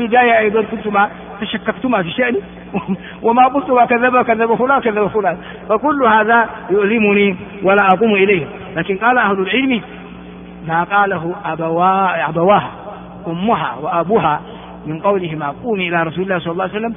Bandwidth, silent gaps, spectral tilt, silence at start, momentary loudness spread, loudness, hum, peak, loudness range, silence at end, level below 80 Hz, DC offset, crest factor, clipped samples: 3.8 kHz; none; -4 dB/octave; 0 s; 13 LU; -15 LUFS; none; 0 dBFS; 4 LU; 0 s; -48 dBFS; under 0.1%; 16 dB; under 0.1%